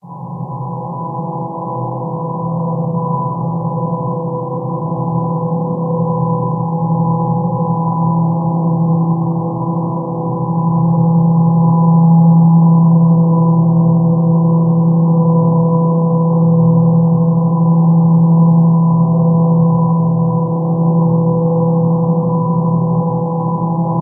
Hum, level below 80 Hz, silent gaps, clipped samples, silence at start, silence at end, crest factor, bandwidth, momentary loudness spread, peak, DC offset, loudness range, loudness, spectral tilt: none; -52 dBFS; none; under 0.1%; 0.05 s; 0 s; 12 dB; 1.2 kHz; 10 LU; -2 dBFS; under 0.1%; 8 LU; -13 LUFS; -17.5 dB/octave